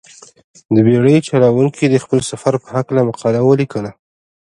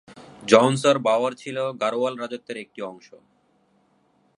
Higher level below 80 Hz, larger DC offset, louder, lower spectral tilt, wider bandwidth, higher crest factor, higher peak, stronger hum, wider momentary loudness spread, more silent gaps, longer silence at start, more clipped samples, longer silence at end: first, -52 dBFS vs -72 dBFS; neither; first, -14 LUFS vs -22 LUFS; first, -7 dB/octave vs -5 dB/octave; about the same, 11.5 kHz vs 11 kHz; second, 14 dB vs 24 dB; about the same, 0 dBFS vs 0 dBFS; neither; second, 8 LU vs 19 LU; neither; first, 0.7 s vs 0.1 s; neither; second, 0.6 s vs 1.4 s